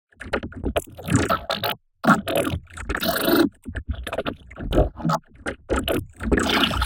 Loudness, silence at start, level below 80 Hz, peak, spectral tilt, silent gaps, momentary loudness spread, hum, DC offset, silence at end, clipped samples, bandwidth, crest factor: -24 LUFS; 0.2 s; -34 dBFS; -2 dBFS; -5 dB/octave; none; 12 LU; none; under 0.1%; 0 s; under 0.1%; 17 kHz; 20 dB